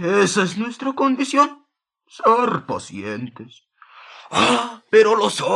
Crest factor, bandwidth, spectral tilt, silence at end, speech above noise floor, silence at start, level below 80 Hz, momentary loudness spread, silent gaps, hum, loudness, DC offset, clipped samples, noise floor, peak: 18 dB; 12 kHz; -4 dB/octave; 0 s; 27 dB; 0 s; -66 dBFS; 14 LU; none; none; -19 LUFS; under 0.1%; under 0.1%; -45 dBFS; -2 dBFS